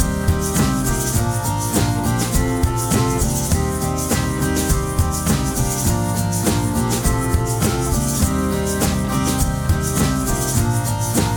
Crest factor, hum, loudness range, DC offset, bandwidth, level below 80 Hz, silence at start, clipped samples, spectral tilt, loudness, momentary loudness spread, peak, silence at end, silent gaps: 14 dB; none; 0 LU; under 0.1%; over 20 kHz; -26 dBFS; 0 s; under 0.1%; -5 dB/octave; -19 LUFS; 2 LU; -4 dBFS; 0 s; none